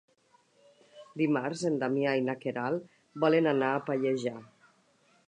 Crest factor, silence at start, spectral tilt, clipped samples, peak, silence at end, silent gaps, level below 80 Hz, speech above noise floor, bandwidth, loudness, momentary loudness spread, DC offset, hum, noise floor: 20 dB; 0.95 s; -6.5 dB/octave; under 0.1%; -12 dBFS; 0.85 s; none; -82 dBFS; 38 dB; 10 kHz; -30 LUFS; 11 LU; under 0.1%; none; -67 dBFS